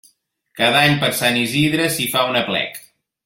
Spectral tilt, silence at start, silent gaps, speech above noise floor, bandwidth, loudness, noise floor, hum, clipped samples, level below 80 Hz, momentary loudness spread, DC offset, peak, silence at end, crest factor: -3.5 dB/octave; 0.55 s; none; 42 dB; 16.5 kHz; -17 LUFS; -59 dBFS; none; under 0.1%; -56 dBFS; 8 LU; under 0.1%; -2 dBFS; 0.45 s; 18 dB